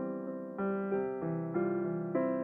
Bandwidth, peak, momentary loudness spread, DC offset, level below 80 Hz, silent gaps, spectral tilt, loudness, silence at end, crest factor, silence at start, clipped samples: 3.4 kHz; -18 dBFS; 5 LU; under 0.1%; -74 dBFS; none; -12 dB/octave; -35 LUFS; 0 s; 16 dB; 0 s; under 0.1%